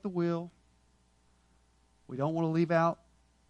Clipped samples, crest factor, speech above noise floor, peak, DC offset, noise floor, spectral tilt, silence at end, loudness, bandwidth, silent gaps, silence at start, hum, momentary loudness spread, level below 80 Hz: under 0.1%; 20 dB; 37 dB; -14 dBFS; under 0.1%; -68 dBFS; -8.5 dB/octave; 0.55 s; -31 LUFS; 7.4 kHz; none; 0.05 s; none; 17 LU; -70 dBFS